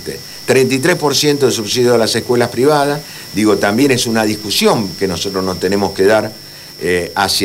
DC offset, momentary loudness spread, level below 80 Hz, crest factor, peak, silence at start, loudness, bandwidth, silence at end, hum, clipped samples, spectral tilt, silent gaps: 0.4%; 10 LU; -50 dBFS; 14 dB; 0 dBFS; 0 s; -14 LUFS; 16.5 kHz; 0 s; none; under 0.1%; -4 dB/octave; none